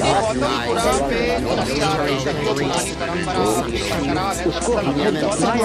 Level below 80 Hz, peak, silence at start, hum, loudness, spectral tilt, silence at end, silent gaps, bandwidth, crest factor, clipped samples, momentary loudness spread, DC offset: -36 dBFS; -4 dBFS; 0 s; none; -20 LUFS; -4.5 dB/octave; 0 s; none; 16 kHz; 16 dB; under 0.1%; 3 LU; under 0.1%